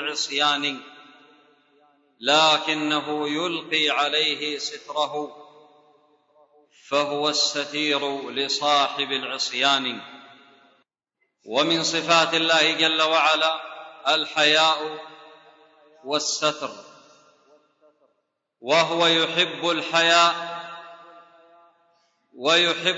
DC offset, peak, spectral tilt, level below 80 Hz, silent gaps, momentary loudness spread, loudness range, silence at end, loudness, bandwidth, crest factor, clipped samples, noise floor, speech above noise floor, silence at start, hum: under 0.1%; -4 dBFS; -2 dB/octave; -82 dBFS; none; 15 LU; 7 LU; 0 s; -21 LUFS; 8 kHz; 20 dB; under 0.1%; -75 dBFS; 53 dB; 0 s; none